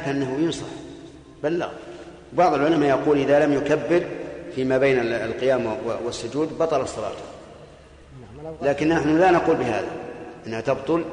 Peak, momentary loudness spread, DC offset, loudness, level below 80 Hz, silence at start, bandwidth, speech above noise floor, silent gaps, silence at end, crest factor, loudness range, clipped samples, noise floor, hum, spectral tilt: -8 dBFS; 19 LU; under 0.1%; -22 LUFS; -52 dBFS; 0 s; 10 kHz; 25 dB; none; 0 s; 14 dB; 6 LU; under 0.1%; -46 dBFS; none; -6 dB/octave